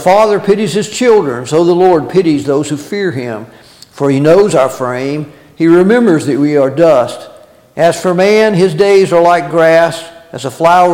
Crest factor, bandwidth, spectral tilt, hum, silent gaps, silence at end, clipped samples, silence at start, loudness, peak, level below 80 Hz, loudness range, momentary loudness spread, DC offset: 10 dB; 16.5 kHz; -6 dB/octave; none; none; 0 s; under 0.1%; 0 s; -10 LUFS; 0 dBFS; -50 dBFS; 3 LU; 13 LU; under 0.1%